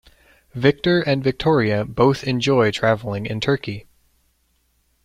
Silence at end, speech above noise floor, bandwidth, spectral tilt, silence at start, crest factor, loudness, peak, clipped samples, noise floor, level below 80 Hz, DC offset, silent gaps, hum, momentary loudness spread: 1.25 s; 46 dB; 13.5 kHz; -6.5 dB/octave; 0.55 s; 18 dB; -19 LUFS; -2 dBFS; under 0.1%; -65 dBFS; -48 dBFS; under 0.1%; none; none; 8 LU